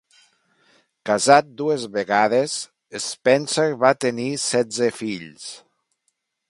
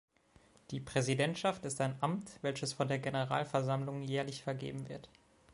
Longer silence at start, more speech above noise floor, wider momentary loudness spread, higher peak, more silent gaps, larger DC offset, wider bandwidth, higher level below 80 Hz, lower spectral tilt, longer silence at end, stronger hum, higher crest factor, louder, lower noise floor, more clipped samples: first, 1.05 s vs 0.7 s; first, 53 dB vs 30 dB; first, 16 LU vs 11 LU; first, 0 dBFS vs -16 dBFS; neither; neither; about the same, 11.5 kHz vs 11.5 kHz; about the same, -68 dBFS vs -70 dBFS; second, -3.5 dB/octave vs -5 dB/octave; first, 0.9 s vs 0.5 s; neither; about the same, 22 dB vs 20 dB; first, -20 LUFS vs -37 LUFS; first, -73 dBFS vs -66 dBFS; neither